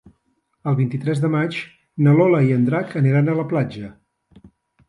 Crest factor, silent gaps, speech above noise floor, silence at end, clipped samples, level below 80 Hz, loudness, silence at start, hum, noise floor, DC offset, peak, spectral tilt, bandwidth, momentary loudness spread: 16 dB; none; 50 dB; 0.4 s; under 0.1%; -60 dBFS; -19 LUFS; 0.65 s; none; -68 dBFS; under 0.1%; -4 dBFS; -9 dB/octave; 10.5 kHz; 15 LU